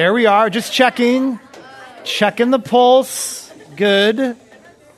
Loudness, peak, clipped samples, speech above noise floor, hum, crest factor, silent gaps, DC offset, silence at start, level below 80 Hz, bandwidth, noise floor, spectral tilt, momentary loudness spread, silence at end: -15 LUFS; 0 dBFS; under 0.1%; 31 dB; none; 16 dB; none; under 0.1%; 0 s; -66 dBFS; 14 kHz; -45 dBFS; -3.5 dB/octave; 16 LU; 0.65 s